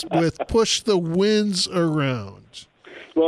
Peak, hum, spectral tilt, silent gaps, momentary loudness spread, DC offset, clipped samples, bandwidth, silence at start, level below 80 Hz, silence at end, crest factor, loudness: -8 dBFS; none; -4.5 dB/octave; none; 15 LU; under 0.1%; under 0.1%; 13 kHz; 0 s; -46 dBFS; 0 s; 14 dB; -21 LUFS